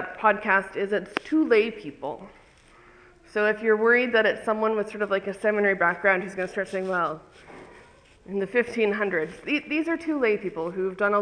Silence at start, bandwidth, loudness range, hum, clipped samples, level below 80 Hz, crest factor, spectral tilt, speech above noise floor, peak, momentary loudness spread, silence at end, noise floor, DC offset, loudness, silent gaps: 0 s; 10.5 kHz; 5 LU; none; under 0.1%; -62 dBFS; 22 dB; -6 dB/octave; 29 dB; -4 dBFS; 10 LU; 0 s; -54 dBFS; under 0.1%; -24 LUFS; none